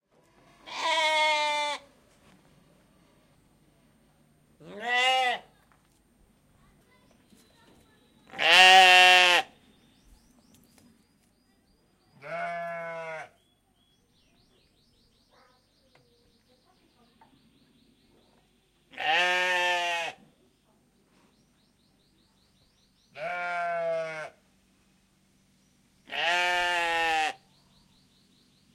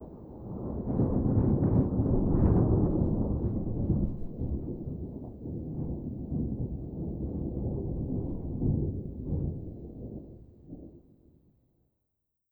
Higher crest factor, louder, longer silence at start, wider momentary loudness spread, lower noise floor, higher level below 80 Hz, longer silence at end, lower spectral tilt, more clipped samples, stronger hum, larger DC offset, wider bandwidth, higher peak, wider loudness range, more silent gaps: first, 28 dB vs 20 dB; first, -23 LUFS vs -31 LUFS; first, 0.65 s vs 0 s; first, 24 LU vs 17 LU; second, -68 dBFS vs -82 dBFS; second, -70 dBFS vs -38 dBFS; second, 1.4 s vs 1.55 s; second, 0 dB/octave vs -14.5 dB/octave; neither; neither; neither; first, 16 kHz vs 2.1 kHz; first, -2 dBFS vs -12 dBFS; first, 21 LU vs 9 LU; neither